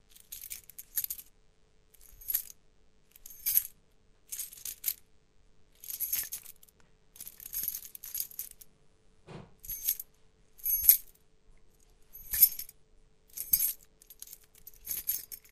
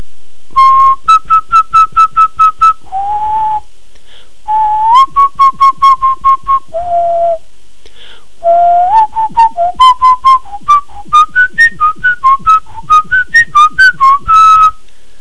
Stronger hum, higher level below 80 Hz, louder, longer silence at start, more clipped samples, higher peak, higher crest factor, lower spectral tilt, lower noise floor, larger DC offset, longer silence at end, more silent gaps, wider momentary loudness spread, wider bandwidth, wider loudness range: neither; second, -62 dBFS vs -38 dBFS; second, -30 LUFS vs -7 LUFS; first, 0.3 s vs 0 s; second, under 0.1% vs 3%; about the same, -2 dBFS vs 0 dBFS; first, 34 dB vs 10 dB; second, 1 dB/octave vs -2 dB/octave; first, -65 dBFS vs -43 dBFS; second, under 0.1% vs 8%; second, 0.15 s vs 0.5 s; neither; first, 25 LU vs 8 LU; first, 16 kHz vs 11 kHz; first, 10 LU vs 4 LU